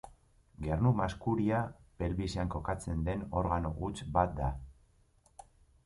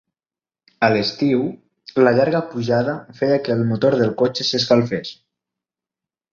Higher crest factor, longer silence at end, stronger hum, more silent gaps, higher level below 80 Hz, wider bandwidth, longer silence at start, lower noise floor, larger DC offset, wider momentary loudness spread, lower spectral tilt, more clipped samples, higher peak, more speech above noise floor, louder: about the same, 20 dB vs 18 dB; second, 0.45 s vs 1.2 s; neither; neither; first, -44 dBFS vs -58 dBFS; first, 11.5 kHz vs 7.4 kHz; second, 0.05 s vs 0.8 s; second, -67 dBFS vs under -90 dBFS; neither; about the same, 9 LU vs 9 LU; first, -7.5 dB/octave vs -6 dB/octave; neither; second, -14 dBFS vs -2 dBFS; second, 35 dB vs over 72 dB; second, -34 LUFS vs -19 LUFS